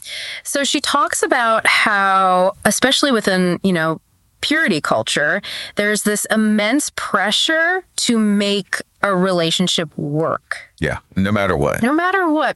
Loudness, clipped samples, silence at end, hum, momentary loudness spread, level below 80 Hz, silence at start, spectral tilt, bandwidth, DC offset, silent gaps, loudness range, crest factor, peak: -17 LUFS; under 0.1%; 0 s; none; 8 LU; -46 dBFS; 0.05 s; -3.5 dB/octave; 14 kHz; under 0.1%; none; 4 LU; 16 dB; 0 dBFS